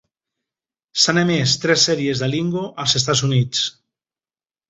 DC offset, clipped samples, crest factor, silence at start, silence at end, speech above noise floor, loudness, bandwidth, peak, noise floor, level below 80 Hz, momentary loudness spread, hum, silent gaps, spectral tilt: under 0.1%; under 0.1%; 18 dB; 0.95 s; 1 s; over 72 dB; -18 LUFS; 8.2 kHz; -2 dBFS; under -90 dBFS; -56 dBFS; 7 LU; none; none; -3.5 dB/octave